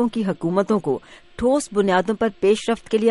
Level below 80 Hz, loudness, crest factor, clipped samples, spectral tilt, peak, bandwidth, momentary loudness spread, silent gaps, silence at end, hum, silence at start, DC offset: -50 dBFS; -21 LUFS; 16 dB; under 0.1%; -5.5 dB/octave; -4 dBFS; 11.5 kHz; 5 LU; none; 0 s; none; 0 s; under 0.1%